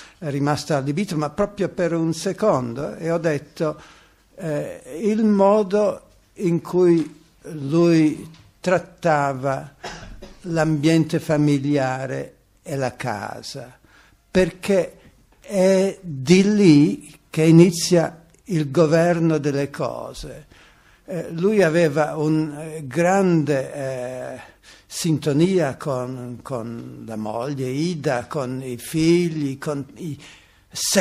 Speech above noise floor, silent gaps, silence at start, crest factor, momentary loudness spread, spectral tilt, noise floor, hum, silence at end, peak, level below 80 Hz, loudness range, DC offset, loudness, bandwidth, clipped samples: 33 dB; none; 0 s; 20 dB; 16 LU; -6 dB/octave; -53 dBFS; none; 0 s; 0 dBFS; -52 dBFS; 7 LU; under 0.1%; -21 LUFS; 15 kHz; under 0.1%